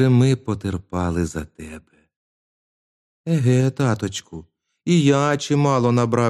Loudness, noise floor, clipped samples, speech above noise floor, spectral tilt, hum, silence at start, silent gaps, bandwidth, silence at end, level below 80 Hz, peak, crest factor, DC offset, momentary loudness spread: -20 LUFS; under -90 dBFS; under 0.1%; over 71 dB; -6.5 dB/octave; none; 0 s; 2.16-3.24 s; 11.5 kHz; 0 s; -46 dBFS; -4 dBFS; 16 dB; under 0.1%; 18 LU